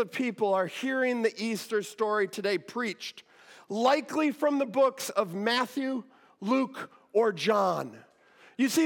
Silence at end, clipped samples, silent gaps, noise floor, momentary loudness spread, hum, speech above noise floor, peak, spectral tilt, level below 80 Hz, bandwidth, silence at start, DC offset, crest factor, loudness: 0 s; under 0.1%; none; -59 dBFS; 10 LU; none; 30 dB; -12 dBFS; -4 dB/octave; under -90 dBFS; 17.5 kHz; 0 s; under 0.1%; 18 dB; -29 LUFS